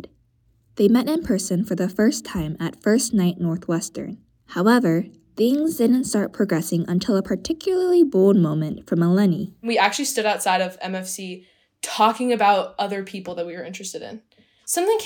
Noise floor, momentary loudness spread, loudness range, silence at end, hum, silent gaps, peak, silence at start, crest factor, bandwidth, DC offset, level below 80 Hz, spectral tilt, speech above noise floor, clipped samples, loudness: -62 dBFS; 14 LU; 4 LU; 0 s; none; none; -2 dBFS; 0.05 s; 18 dB; 19 kHz; under 0.1%; -54 dBFS; -5 dB/octave; 41 dB; under 0.1%; -21 LUFS